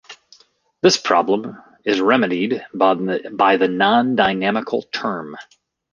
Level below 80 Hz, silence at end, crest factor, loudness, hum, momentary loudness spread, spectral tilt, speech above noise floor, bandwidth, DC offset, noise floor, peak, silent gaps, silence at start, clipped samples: -60 dBFS; 0.5 s; 18 dB; -18 LUFS; none; 10 LU; -4 dB/octave; 38 dB; 10 kHz; under 0.1%; -55 dBFS; -2 dBFS; none; 0.1 s; under 0.1%